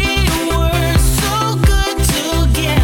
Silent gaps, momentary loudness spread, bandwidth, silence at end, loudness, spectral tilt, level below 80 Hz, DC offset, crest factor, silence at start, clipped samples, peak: none; 2 LU; 18.5 kHz; 0 s; -15 LUFS; -4.5 dB/octave; -18 dBFS; under 0.1%; 10 dB; 0 s; under 0.1%; -2 dBFS